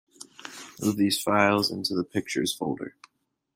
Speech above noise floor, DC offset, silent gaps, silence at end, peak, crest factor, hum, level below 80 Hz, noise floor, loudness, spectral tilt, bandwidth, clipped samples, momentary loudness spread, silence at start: 19 dB; under 0.1%; none; 0.65 s; -6 dBFS; 22 dB; none; -66 dBFS; -45 dBFS; -26 LUFS; -4 dB/octave; 16 kHz; under 0.1%; 19 LU; 0.2 s